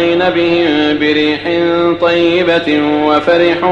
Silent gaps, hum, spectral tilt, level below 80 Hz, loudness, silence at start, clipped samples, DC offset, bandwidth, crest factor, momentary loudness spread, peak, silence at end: none; none; -6 dB/octave; -48 dBFS; -11 LUFS; 0 s; under 0.1%; under 0.1%; 7.6 kHz; 10 dB; 2 LU; 0 dBFS; 0 s